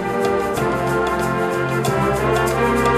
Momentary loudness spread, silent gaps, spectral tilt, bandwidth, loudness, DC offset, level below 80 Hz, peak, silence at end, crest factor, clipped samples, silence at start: 2 LU; none; -5.5 dB/octave; 15.5 kHz; -19 LUFS; 0.1%; -36 dBFS; -6 dBFS; 0 s; 12 dB; under 0.1%; 0 s